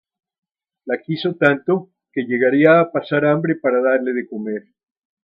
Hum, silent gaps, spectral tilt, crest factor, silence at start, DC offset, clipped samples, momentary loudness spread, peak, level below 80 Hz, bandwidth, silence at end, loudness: none; none; -9 dB/octave; 18 dB; 0.85 s; under 0.1%; under 0.1%; 14 LU; 0 dBFS; -70 dBFS; 5.4 kHz; 0.65 s; -18 LUFS